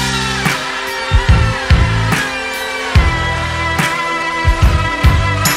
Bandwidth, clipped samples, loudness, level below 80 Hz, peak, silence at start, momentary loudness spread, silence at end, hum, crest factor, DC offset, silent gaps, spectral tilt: 16 kHz; under 0.1%; -14 LUFS; -18 dBFS; 0 dBFS; 0 s; 5 LU; 0 s; none; 14 dB; under 0.1%; none; -4.5 dB/octave